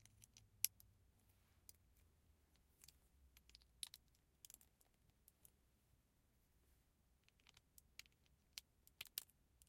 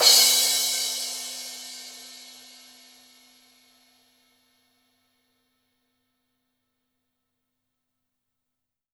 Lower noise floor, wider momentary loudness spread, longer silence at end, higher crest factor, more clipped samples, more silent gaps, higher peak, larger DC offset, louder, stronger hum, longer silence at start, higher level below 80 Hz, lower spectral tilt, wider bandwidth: second, -80 dBFS vs -85 dBFS; second, 24 LU vs 28 LU; second, 0.05 s vs 6.65 s; first, 48 dB vs 28 dB; neither; neither; second, -14 dBFS vs -2 dBFS; neither; second, -52 LUFS vs -20 LUFS; neither; about the same, 0.05 s vs 0 s; first, -80 dBFS vs under -90 dBFS; first, 1 dB/octave vs 3.5 dB/octave; second, 16 kHz vs over 20 kHz